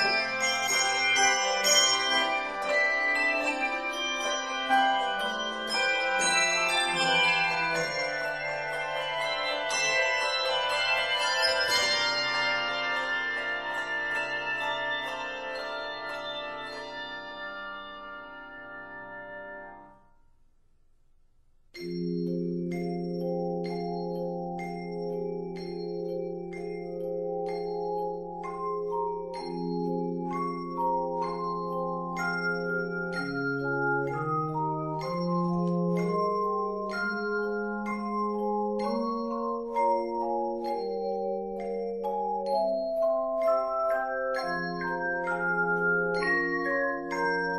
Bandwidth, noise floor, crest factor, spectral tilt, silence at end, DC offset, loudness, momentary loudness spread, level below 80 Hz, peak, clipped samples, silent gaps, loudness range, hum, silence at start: 14.5 kHz; -61 dBFS; 20 dB; -3 dB/octave; 0 s; under 0.1%; -28 LUFS; 12 LU; -60 dBFS; -10 dBFS; under 0.1%; none; 11 LU; none; 0 s